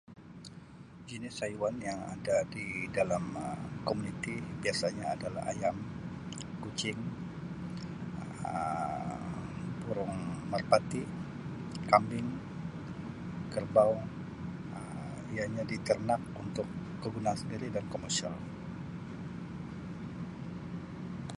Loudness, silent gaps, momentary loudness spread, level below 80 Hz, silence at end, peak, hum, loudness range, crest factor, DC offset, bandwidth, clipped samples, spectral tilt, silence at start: -36 LUFS; none; 13 LU; -58 dBFS; 0 s; -8 dBFS; none; 6 LU; 28 dB; under 0.1%; 11.5 kHz; under 0.1%; -5.5 dB/octave; 0.1 s